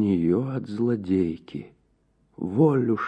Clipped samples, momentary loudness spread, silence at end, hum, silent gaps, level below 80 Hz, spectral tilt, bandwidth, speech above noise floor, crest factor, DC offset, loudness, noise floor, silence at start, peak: under 0.1%; 15 LU; 0 s; none; none; -58 dBFS; -10 dB/octave; 8.8 kHz; 42 dB; 16 dB; under 0.1%; -24 LUFS; -66 dBFS; 0 s; -8 dBFS